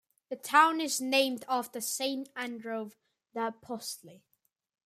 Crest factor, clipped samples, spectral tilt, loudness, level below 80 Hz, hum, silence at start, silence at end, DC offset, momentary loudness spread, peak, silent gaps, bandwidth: 24 dB; under 0.1%; -1.5 dB/octave; -30 LUFS; -86 dBFS; none; 0.3 s; 0.7 s; under 0.1%; 18 LU; -10 dBFS; none; 15.5 kHz